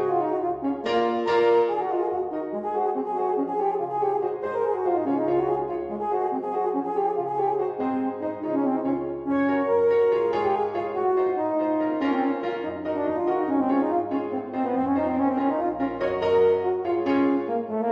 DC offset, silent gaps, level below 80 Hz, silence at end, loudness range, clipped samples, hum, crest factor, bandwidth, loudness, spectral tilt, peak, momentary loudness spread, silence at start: under 0.1%; none; -62 dBFS; 0 s; 2 LU; under 0.1%; none; 14 dB; 7.2 kHz; -25 LUFS; -7.5 dB/octave; -10 dBFS; 7 LU; 0 s